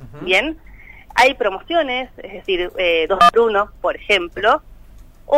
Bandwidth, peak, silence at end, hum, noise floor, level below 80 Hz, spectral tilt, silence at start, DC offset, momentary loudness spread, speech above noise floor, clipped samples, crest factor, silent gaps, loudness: 16 kHz; -4 dBFS; 0 s; none; -42 dBFS; -42 dBFS; -3.5 dB/octave; 0 s; under 0.1%; 12 LU; 24 dB; under 0.1%; 16 dB; none; -17 LUFS